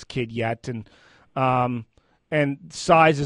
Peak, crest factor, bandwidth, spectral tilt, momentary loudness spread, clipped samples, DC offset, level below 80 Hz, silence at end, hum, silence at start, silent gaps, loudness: -4 dBFS; 20 dB; 11.5 kHz; -6 dB/octave; 17 LU; under 0.1%; under 0.1%; -54 dBFS; 0 s; none; 0 s; none; -23 LUFS